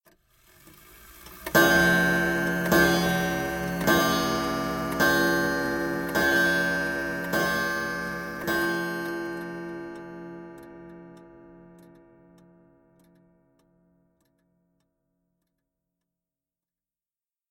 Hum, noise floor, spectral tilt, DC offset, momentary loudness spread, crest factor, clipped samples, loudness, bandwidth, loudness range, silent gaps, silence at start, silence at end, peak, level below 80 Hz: none; under -90 dBFS; -4 dB/octave; under 0.1%; 20 LU; 22 dB; under 0.1%; -24 LUFS; 17 kHz; 16 LU; none; 1 s; 5.95 s; -6 dBFS; -50 dBFS